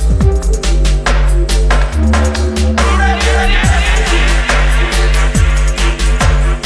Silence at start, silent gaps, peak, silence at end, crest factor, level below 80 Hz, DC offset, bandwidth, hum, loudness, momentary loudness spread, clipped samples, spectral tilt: 0 s; none; 0 dBFS; 0 s; 10 dB; -12 dBFS; under 0.1%; 11 kHz; none; -12 LUFS; 3 LU; under 0.1%; -4.5 dB/octave